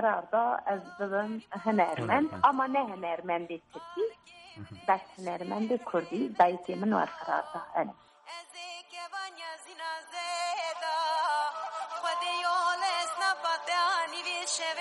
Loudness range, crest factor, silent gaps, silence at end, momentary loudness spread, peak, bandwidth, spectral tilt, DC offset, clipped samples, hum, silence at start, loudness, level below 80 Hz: 6 LU; 20 dB; none; 0 s; 15 LU; -10 dBFS; 11.5 kHz; -3.5 dB/octave; under 0.1%; under 0.1%; none; 0 s; -31 LUFS; -76 dBFS